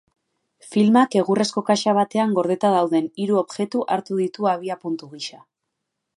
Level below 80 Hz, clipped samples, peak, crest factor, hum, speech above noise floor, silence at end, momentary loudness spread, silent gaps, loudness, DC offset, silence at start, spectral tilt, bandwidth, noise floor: -72 dBFS; under 0.1%; -4 dBFS; 18 dB; none; 59 dB; 0.8 s; 12 LU; none; -21 LUFS; under 0.1%; 0.65 s; -5.5 dB/octave; 11.5 kHz; -79 dBFS